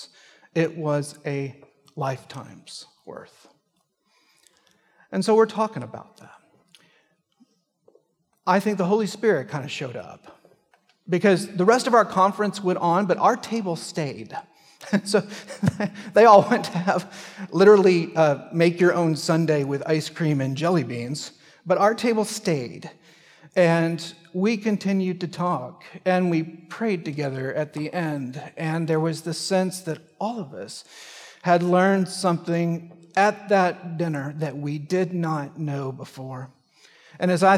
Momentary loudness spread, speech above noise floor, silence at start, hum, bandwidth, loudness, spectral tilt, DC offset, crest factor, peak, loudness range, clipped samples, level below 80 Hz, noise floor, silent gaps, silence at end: 18 LU; 49 dB; 0 s; none; 14.5 kHz; -23 LUFS; -6 dB/octave; under 0.1%; 22 dB; -2 dBFS; 9 LU; under 0.1%; -70 dBFS; -71 dBFS; none; 0 s